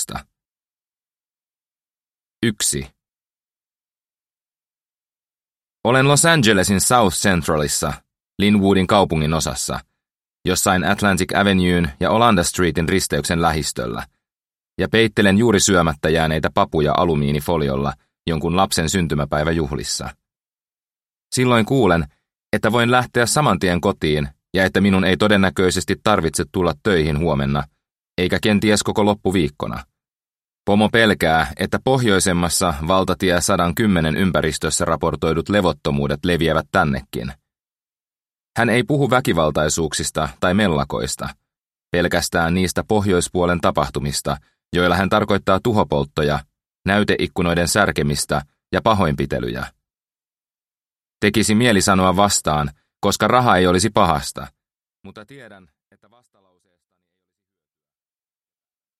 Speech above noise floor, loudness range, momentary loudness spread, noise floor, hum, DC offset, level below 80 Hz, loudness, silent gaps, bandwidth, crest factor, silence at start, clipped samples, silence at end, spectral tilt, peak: over 72 dB; 5 LU; 10 LU; under -90 dBFS; none; under 0.1%; -40 dBFS; -18 LUFS; 2.27-2.31 s; 15.5 kHz; 20 dB; 0 s; under 0.1%; 3.45 s; -4.5 dB/octave; 0 dBFS